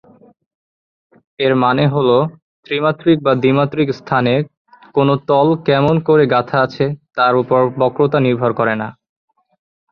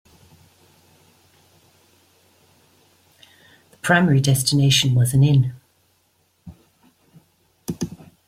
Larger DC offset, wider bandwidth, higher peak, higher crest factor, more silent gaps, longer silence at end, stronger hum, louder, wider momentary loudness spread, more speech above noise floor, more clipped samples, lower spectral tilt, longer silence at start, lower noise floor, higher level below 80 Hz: neither; second, 6.4 kHz vs 15.5 kHz; about the same, -2 dBFS vs -2 dBFS; second, 14 dB vs 20 dB; first, 2.42-2.63 s, 4.57-4.65 s vs none; first, 1 s vs 0.4 s; neither; first, -15 LUFS vs -18 LUFS; second, 7 LU vs 16 LU; first, over 76 dB vs 48 dB; neither; first, -9 dB/octave vs -4.5 dB/octave; second, 1.4 s vs 3.85 s; first, under -90 dBFS vs -64 dBFS; about the same, -54 dBFS vs -54 dBFS